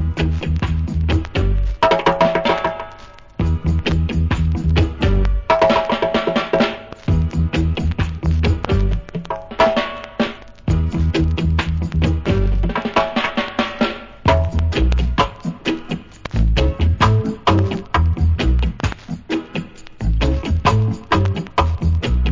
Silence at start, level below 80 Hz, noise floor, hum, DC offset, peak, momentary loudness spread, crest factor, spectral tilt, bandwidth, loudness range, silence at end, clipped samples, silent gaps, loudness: 0 s; -22 dBFS; -39 dBFS; none; under 0.1%; 0 dBFS; 8 LU; 18 dB; -7 dB/octave; 7.6 kHz; 2 LU; 0 s; under 0.1%; none; -19 LUFS